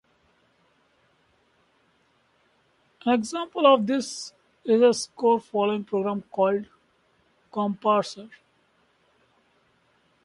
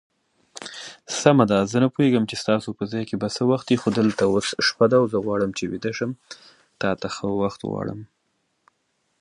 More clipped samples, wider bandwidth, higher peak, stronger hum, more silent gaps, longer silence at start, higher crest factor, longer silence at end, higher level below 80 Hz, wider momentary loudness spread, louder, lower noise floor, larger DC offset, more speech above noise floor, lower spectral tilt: neither; about the same, 11.5 kHz vs 11.5 kHz; second, -6 dBFS vs 0 dBFS; neither; neither; first, 3.05 s vs 0.55 s; about the same, 22 dB vs 22 dB; first, 1.9 s vs 1.15 s; second, -72 dBFS vs -58 dBFS; about the same, 16 LU vs 18 LU; about the same, -24 LUFS vs -22 LUFS; second, -66 dBFS vs -72 dBFS; neither; second, 43 dB vs 50 dB; about the same, -4.5 dB/octave vs -5.5 dB/octave